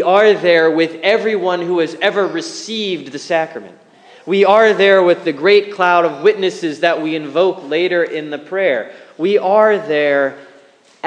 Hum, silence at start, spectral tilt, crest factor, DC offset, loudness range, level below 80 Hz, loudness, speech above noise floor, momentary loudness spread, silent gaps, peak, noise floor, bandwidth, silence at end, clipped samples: none; 0 s; -4.5 dB/octave; 14 dB; under 0.1%; 5 LU; -70 dBFS; -14 LUFS; 33 dB; 11 LU; none; 0 dBFS; -47 dBFS; 9.6 kHz; 0 s; under 0.1%